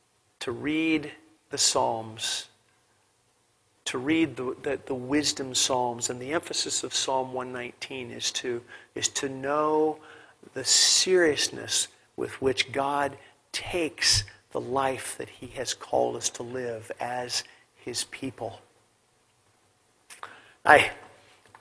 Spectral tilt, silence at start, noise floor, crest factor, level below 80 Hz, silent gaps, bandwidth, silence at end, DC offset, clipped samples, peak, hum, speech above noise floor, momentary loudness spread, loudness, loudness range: -2 dB/octave; 0.4 s; -68 dBFS; 28 dB; -58 dBFS; none; 11 kHz; 0.55 s; under 0.1%; under 0.1%; -2 dBFS; none; 40 dB; 15 LU; -27 LUFS; 8 LU